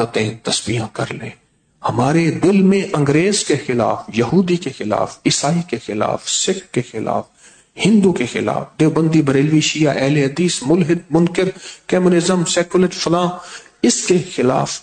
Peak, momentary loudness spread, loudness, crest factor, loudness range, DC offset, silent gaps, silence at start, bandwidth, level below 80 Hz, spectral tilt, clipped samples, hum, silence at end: -4 dBFS; 8 LU; -17 LUFS; 14 dB; 3 LU; under 0.1%; none; 0 s; 9.4 kHz; -52 dBFS; -5 dB/octave; under 0.1%; none; 0 s